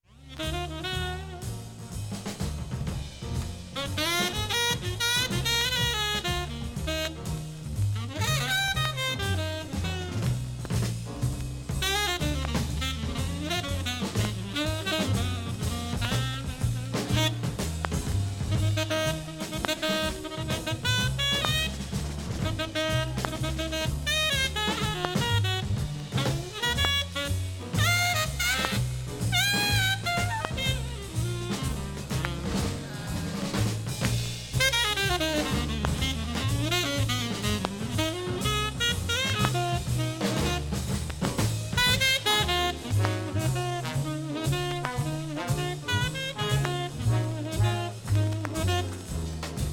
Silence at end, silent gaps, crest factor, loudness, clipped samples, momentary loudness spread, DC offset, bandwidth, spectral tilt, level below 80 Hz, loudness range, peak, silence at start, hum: 0 s; none; 24 dB; -28 LUFS; under 0.1%; 9 LU; under 0.1%; 17.5 kHz; -4 dB/octave; -40 dBFS; 4 LU; -4 dBFS; 0.15 s; none